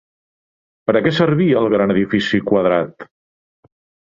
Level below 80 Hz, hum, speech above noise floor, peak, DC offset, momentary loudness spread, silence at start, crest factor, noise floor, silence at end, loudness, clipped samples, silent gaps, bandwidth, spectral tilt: -52 dBFS; none; over 75 dB; -2 dBFS; under 0.1%; 5 LU; 0.9 s; 16 dB; under -90 dBFS; 1.1 s; -16 LUFS; under 0.1%; none; 7.6 kHz; -7.5 dB/octave